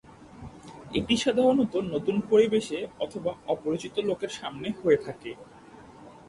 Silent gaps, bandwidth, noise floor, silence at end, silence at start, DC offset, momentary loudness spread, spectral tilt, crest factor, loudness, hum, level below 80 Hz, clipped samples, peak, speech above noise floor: none; 11.5 kHz; -49 dBFS; 0.1 s; 0.1 s; under 0.1%; 22 LU; -5 dB/octave; 18 dB; -27 LUFS; none; -58 dBFS; under 0.1%; -10 dBFS; 23 dB